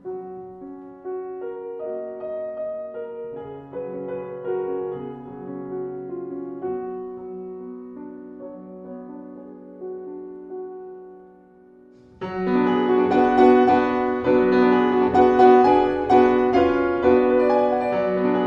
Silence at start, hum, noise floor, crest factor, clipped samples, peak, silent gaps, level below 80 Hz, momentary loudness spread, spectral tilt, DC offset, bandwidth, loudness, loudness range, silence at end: 0.05 s; none; -50 dBFS; 18 dB; under 0.1%; -2 dBFS; none; -52 dBFS; 22 LU; -8 dB/octave; under 0.1%; 6.4 kHz; -20 LUFS; 20 LU; 0 s